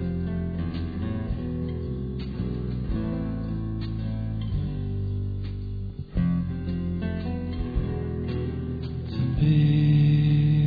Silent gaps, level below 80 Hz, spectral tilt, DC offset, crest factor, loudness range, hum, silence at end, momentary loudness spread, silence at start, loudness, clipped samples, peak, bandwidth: none; -36 dBFS; -11 dB/octave; 0.2%; 14 dB; 6 LU; none; 0 s; 12 LU; 0 s; -27 LUFS; under 0.1%; -10 dBFS; 5 kHz